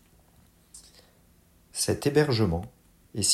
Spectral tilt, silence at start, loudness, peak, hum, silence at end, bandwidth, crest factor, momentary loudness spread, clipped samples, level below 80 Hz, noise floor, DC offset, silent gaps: -4 dB/octave; 0.75 s; -26 LUFS; -8 dBFS; none; 0 s; 16 kHz; 22 dB; 26 LU; under 0.1%; -50 dBFS; -60 dBFS; under 0.1%; none